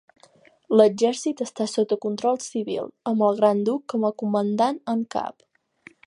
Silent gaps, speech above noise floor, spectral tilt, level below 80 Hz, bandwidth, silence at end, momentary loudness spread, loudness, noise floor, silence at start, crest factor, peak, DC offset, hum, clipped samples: none; 34 dB; -5.5 dB/octave; -76 dBFS; 11 kHz; 0.75 s; 10 LU; -23 LUFS; -56 dBFS; 0.7 s; 22 dB; -2 dBFS; under 0.1%; none; under 0.1%